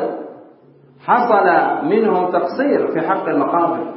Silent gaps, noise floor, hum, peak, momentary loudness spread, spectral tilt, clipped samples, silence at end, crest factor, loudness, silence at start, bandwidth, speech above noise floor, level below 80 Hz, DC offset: none; -47 dBFS; none; -2 dBFS; 11 LU; -11 dB/octave; under 0.1%; 0 s; 16 dB; -16 LUFS; 0 s; 5.8 kHz; 32 dB; -74 dBFS; under 0.1%